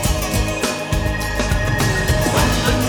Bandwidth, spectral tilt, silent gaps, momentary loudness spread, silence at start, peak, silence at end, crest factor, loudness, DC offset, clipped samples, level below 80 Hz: over 20 kHz; -4.5 dB/octave; none; 5 LU; 0 s; -4 dBFS; 0 s; 14 dB; -18 LUFS; under 0.1%; under 0.1%; -24 dBFS